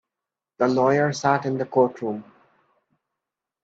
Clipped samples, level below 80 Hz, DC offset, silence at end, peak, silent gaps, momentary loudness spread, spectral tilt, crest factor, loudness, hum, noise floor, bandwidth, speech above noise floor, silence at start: under 0.1%; -70 dBFS; under 0.1%; 1.4 s; -6 dBFS; none; 12 LU; -6 dB/octave; 20 dB; -22 LUFS; none; -87 dBFS; 8 kHz; 66 dB; 0.6 s